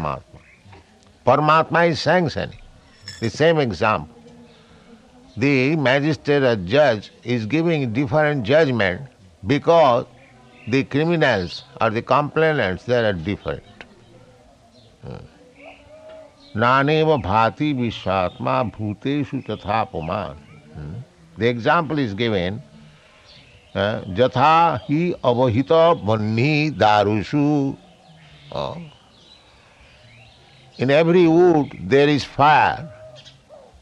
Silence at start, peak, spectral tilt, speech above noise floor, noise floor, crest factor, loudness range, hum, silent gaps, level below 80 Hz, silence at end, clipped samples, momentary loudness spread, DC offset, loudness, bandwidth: 0 s; 0 dBFS; -7 dB/octave; 32 dB; -51 dBFS; 20 dB; 8 LU; none; none; -54 dBFS; 0.25 s; under 0.1%; 17 LU; under 0.1%; -19 LUFS; 9.6 kHz